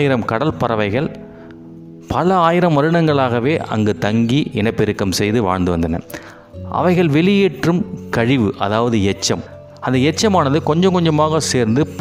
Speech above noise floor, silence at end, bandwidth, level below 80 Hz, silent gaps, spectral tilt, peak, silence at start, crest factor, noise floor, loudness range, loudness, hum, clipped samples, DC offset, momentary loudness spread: 21 dB; 0 s; 16 kHz; -46 dBFS; none; -6 dB/octave; 0 dBFS; 0 s; 16 dB; -36 dBFS; 2 LU; -16 LUFS; none; under 0.1%; under 0.1%; 11 LU